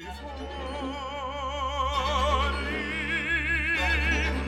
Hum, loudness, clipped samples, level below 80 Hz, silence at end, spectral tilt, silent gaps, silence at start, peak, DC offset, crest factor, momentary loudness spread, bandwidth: none; -27 LUFS; under 0.1%; -34 dBFS; 0 s; -4.5 dB/octave; none; 0 s; -12 dBFS; under 0.1%; 16 dB; 11 LU; 13 kHz